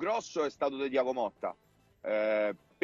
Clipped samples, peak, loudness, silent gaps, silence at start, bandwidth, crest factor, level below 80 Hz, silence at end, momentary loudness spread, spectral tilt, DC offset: under 0.1%; -16 dBFS; -33 LUFS; none; 0 s; 7.6 kHz; 16 dB; -74 dBFS; 0.3 s; 9 LU; -4 dB/octave; under 0.1%